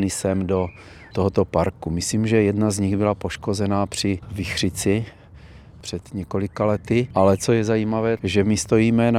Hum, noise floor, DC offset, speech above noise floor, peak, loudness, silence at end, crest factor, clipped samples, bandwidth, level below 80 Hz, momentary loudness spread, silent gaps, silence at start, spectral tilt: none; -44 dBFS; under 0.1%; 23 dB; -4 dBFS; -22 LUFS; 0 s; 18 dB; under 0.1%; 15 kHz; -48 dBFS; 10 LU; none; 0 s; -5.5 dB/octave